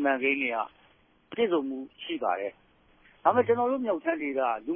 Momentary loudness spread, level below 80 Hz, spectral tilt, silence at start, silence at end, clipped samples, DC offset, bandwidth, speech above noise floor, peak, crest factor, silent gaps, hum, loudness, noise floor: 12 LU; -70 dBFS; -9 dB/octave; 0 s; 0 s; under 0.1%; under 0.1%; 3.6 kHz; 35 dB; -8 dBFS; 20 dB; none; none; -28 LUFS; -63 dBFS